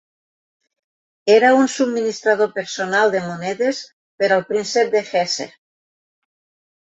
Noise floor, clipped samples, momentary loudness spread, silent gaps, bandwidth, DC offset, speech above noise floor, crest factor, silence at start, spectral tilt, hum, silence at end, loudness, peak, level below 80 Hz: under -90 dBFS; under 0.1%; 11 LU; 3.93-4.18 s; 8.2 kHz; under 0.1%; over 72 dB; 18 dB; 1.25 s; -3.5 dB/octave; none; 1.35 s; -18 LUFS; -2 dBFS; -68 dBFS